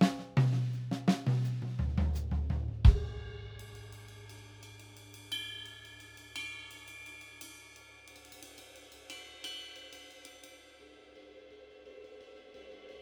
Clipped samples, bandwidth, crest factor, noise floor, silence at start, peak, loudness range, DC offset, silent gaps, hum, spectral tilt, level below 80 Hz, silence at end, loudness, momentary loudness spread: under 0.1%; over 20 kHz; 26 dB; -57 dBFS; 0 s; -8 dBFS; 16 LU; under 0.1%; none; none; -6 dB/octave; -38 dBFS; 0 s; -34 LUFS; 23 LU